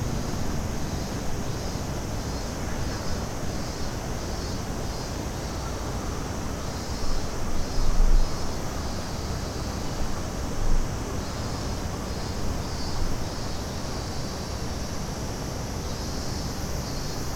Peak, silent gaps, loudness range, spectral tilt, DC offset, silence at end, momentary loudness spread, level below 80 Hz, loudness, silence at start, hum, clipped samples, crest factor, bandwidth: -10 dBFS; none; 2 LU; -4.5 dB/octave; under 0.1%; 0 s; 2 LU; -30 dBFS; -31 LUFS; 0 s; none; under 0.1%; 18 dB; 16.5 kHz